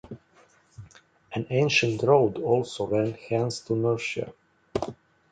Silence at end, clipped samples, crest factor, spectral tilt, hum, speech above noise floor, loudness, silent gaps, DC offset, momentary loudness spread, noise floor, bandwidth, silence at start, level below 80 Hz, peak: 0.4 s; under 0.1%; 22 dB; -5.5 dB/octave; none; 35 dB; -26 LUFS; none; under 0.1%; 15 LU; -60 dBFS; 9.4 kHz; 0.05 s; -58 dBFS; -6 dBFS